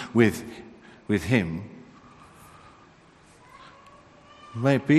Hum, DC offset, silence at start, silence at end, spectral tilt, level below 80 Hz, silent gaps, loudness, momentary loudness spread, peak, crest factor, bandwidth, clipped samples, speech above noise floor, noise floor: none; under 0.1%; 0 s; 0 s; -7 dB/octave; -58 dBFS; none; -25 LUFS; 27 LU; -4 dBFS; 22 dB; 13 kHz; under 0.1%; 32 dB; -54 dBFS